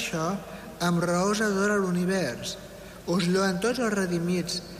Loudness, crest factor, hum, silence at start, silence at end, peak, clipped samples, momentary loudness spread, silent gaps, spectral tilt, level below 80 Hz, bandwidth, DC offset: -26 LUFS; 12 dB; none; 0 s; 0 s; -14 dBFS; under 0.1%; 11 LU; none; -5 dB/octave; -54 dBFS; 15.5 kHz; under 0.1%